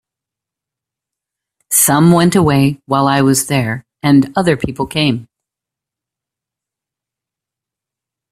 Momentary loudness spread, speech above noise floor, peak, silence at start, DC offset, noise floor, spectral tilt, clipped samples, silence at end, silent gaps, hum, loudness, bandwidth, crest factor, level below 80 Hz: 9 LU; 73 dB; 0 dBFS; 1.7 s; under 0.1%; -85 dBFS; -5 dB/octave; under 0.1%; 3.1 s; none; none; -13 LUFS; 16 kHz; 16 dB; -48 dBFS